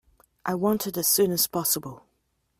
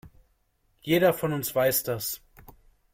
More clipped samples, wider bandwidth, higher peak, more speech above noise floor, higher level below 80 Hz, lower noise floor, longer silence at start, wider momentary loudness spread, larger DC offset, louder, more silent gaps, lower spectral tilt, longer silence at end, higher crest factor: neither; about the same, 16 kHz vs 16.5 kHz; about the same, -10 dBFS vs -10 dBFS; first, 48 dB vs 44 dB; about the same, -62 dBFS vs -58 dBFS; first, -73 dBFS vs -69 dBFS; first, 0.45 s vs 0.05 s; about the same, 12 LU vs 13 LU; neither; about the same, -24 LUFS vs -25 LUFS; neither; about the same, -3.5 dB/octave vs -4.5 dB/octave; about the same, 0.6 s vs 0.55 s; about the same, 18 dB vs 18 dB